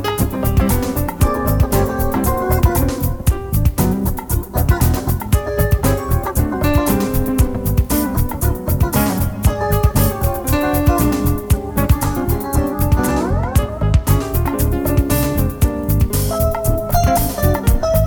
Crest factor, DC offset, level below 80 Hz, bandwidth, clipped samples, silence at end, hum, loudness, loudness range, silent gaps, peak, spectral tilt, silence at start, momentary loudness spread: 14 dB; under 0.1%; -20 dBFS; 19.5 kHz; under 0.1%; 0 s; none; -17 LUFS; 1 LU; none; 0 dBFS; -6 dB/octave; 0 s; 4 LU